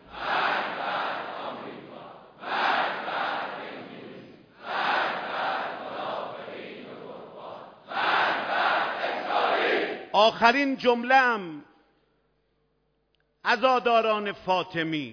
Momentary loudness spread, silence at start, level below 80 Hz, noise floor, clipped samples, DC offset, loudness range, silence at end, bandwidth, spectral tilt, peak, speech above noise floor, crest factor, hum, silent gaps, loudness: 21 LU; 0.05 s; -70 dBFS; -72 dBFS; under 0.1%; under 0.1%; 8 LU; 0 s; 5.4 kHz; -4.5 dB/octave; -6 dBFS; 48 dB; 22 dB; none; none; -26 LUFS